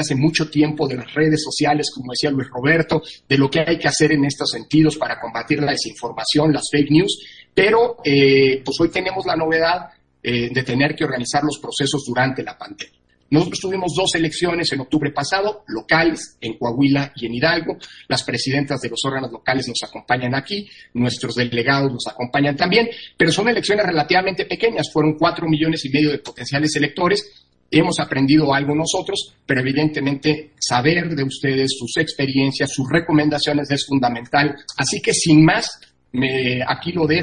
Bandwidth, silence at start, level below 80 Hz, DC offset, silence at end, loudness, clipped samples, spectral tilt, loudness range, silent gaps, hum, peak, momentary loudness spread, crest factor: 10.5 kHz; 0 s; -50 dBFS; under 0.1%; 0 s; -19 LUFS; under 0.1%; -4.5 dB/octave; 4 LU; none; none; -2 dBFS; 8 LU; 18 dB